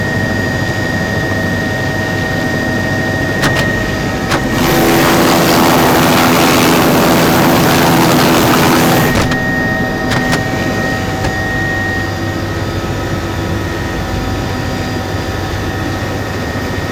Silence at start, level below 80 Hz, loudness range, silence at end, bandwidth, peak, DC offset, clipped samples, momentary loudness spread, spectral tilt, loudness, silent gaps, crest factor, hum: 0 s; -28 dBFS; 9 LU; 0 s; over 20 kHz; -2 dBFS; under 0.1%; under 0.1%; 9 LU; -4.5 dB/octave; -12 LUFS; none; 12 dB; none